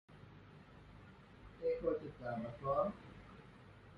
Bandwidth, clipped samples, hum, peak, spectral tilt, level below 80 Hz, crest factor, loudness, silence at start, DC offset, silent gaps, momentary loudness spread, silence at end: 6.6 kHz; under 0.1%; none; -24 dBFS; -8.5 dB/octave; -64 dBFS; 20 dB; -41 LUFS; 0.1 s; under 0.1%; none; 22 LU; 0 s